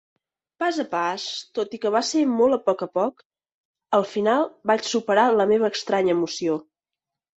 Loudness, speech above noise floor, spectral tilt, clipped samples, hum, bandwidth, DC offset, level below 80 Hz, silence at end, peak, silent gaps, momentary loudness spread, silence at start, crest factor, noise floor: -23 LUFS; 66 dB; -4 dB/octave; under 0.1%; none; 8.2 kHz; under 0.1%; -68 dBFS; 0.75 s; -6 dBFS; 3.25-3.30 s, 3.54-3.74 s; 8 LU; 0.6 s; 18 dB; -88 dBFS